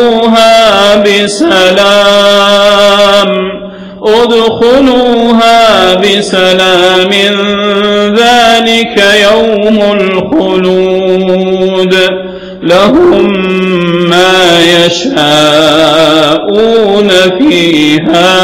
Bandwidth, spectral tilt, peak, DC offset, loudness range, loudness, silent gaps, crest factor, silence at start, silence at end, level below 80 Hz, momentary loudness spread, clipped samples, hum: 16.5 kHz; -4 dB/octave; 0 dBFS; under 0.1%; 3 LU; -5 LUFS; none; 6 dB; 0 s; 0 s; -38 dBFS; 5 LU; 0.3%; none